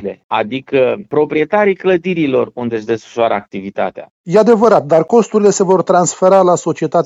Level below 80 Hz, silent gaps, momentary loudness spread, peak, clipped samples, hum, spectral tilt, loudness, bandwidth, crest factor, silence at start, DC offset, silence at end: -58 dBFS; 0.24-0.29 s, 4.10-4.24 s; 10 LU; 0 dBFS; under 0.1%; none; -5.5 dB/octave; -13 LUFS; 8 kHz; 12 dB; 0 s; under 0.1%; 0 s